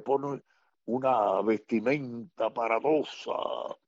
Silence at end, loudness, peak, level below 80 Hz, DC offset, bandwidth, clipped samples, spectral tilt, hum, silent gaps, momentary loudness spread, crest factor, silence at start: 0.15 s; -29 LUFS; -14 dBFS; -76 dBFS; under 0.1%; 7.8 kHz; under 0.1%; -6.5 dB/octave; none; none; 11 LU; 16 dB; 0 s